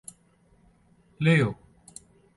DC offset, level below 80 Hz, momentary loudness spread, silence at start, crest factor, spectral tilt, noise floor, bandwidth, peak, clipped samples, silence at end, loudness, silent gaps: under 0.1%; -60 dBFS; 25 LU; 1.2 s; 18 dB; -6.5 dB/octave; -62 dBFS; 11.5 kHz; -10 dBFS; under 0.1%; 0.85 s; -24 LUFS; none